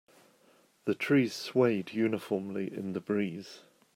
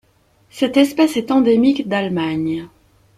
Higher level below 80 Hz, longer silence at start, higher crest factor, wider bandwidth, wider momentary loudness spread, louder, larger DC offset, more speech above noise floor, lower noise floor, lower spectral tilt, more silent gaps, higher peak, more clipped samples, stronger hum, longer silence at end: second, -78 dBFS vs -56 dBFS; first, 0.85 s vs 0.55 s; about the same, 18 dB vs 16 dB; first, 16 kHz vs 14.5 kHz; about the same, 10 LU vs 8 LU; second, -31 LUFS vs -17 LUFS; neither; second, 34 dB vs 40 dB; first, -65 dBFS vs -56 dBFS; about the same, -6.5 dB/octave vs -6 dB/octave; neither; second, -14 dBFS vs -2 dBFS; neither; neither; second, 0.35 s vs 0.5 s